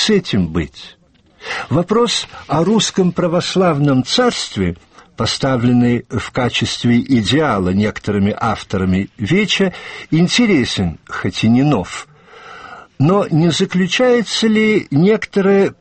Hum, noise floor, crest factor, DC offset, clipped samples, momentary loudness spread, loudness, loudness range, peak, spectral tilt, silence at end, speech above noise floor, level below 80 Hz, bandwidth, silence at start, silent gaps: none; -43 dBFS; 12 dB; 0.1%; under 0.1%; 9 LU; -15 LUFS; 2 LU; -2 dBFS; -5.5 dB/octave; 0.1 s; 28 dB; -44 dBFS; 8.8 kHz; 0 s; none